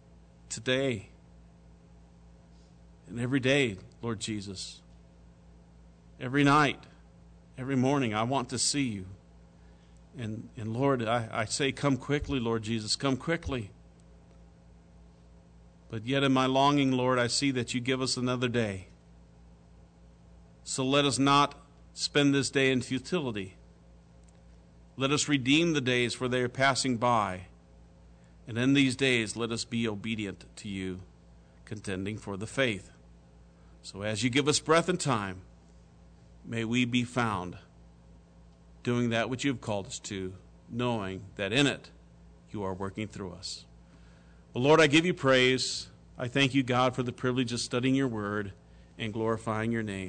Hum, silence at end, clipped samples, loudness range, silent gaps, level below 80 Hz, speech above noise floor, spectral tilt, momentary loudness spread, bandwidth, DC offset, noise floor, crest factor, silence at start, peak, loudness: 60 Hz at -55 dBFS; 0 s; under 0.1%; 7 LU; none; -56 dBFS; 27 dB; -4.5 dB/octave; 15 LU; 9.4 kHz; under 0.1%; -56 dBFS; 18 dB; 0.5 s; -12 dBFS; -29 LUFS